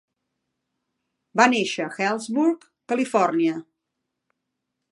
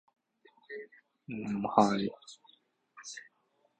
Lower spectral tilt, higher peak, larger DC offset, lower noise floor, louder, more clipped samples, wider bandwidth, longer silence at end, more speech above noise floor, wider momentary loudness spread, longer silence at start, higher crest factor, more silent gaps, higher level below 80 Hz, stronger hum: second, -4 dB/octave vs -5.5 dB/octave; first, -2 dBFS vs -8 dBFS; neither; first, -81 dBFS vs -74 dBFS; first, -22 LUFS vs -31 LUFS; neither; first, 11.5 kHz vs 9 kHz; first, 1.3 s vs 0.55 s; first, 59 dB vs 43 dB; second, 10 LU vs 25 LU; first, 1.35 s vs 0.7 s; about the same, 24 dB vs 28 dB; neither; second, -82 dBFS vs -70 dBFS; neither